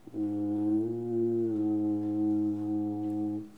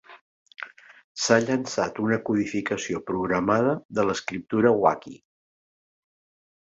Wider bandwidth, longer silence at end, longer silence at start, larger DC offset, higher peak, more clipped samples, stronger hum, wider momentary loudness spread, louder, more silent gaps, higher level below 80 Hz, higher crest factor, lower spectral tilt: second, 2.5 kHz vs 8 kHz; second, 0 s vs 1.6 s; about the same, 0.05 s vs 0.1 s; first, 0.1% vs under 0.1%; second, -20 dBFS vs -4 dBFS; neither; neither; second, 4 LU vs 19 LU; second, -31 LUFS vs -24 LUFS; second, none vs 0.21-0.46 s, 1.04-1.15 s, 3.85-3.89 s; second, -76 dBFS vs -60 dBFS; second, 10 dB vs 22 dB; first, -10.5 dB/octave vs -5 dB/octave